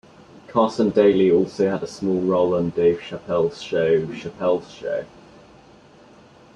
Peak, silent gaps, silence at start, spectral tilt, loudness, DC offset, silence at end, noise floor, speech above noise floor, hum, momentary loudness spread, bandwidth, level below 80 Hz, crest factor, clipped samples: -4 dBFS; none; 0.5 s; -7 dB/octave; -21 LUFS; under 0.1%; 1.5 s; -49 dBFS; 29 dB; none; 11 LU; 9.2 kHz; -58 dBFS; 18 dB; under 0.1%